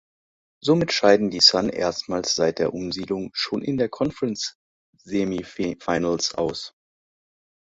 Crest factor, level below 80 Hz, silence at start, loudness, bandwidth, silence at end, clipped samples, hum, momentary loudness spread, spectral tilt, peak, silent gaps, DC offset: 22 dB; -56 dBFS; 0.65 s; -22 LUFS; 8 kHz; 0.95 s; under 0.1%; none; 14 LU; -4 dB/octave; -2 dBFS; 4.55-4.93 s; under 0.1%